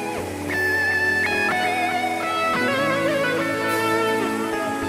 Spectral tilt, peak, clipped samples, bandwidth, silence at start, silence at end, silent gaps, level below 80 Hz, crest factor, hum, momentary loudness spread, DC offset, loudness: -4 dB/octave; -10 dBFS; under 0.1%; 16 kHz; 0 s; 0 s; none; -56 dBFS; 12 dB; none; 5 LU; under 0.1%; -21 LUFS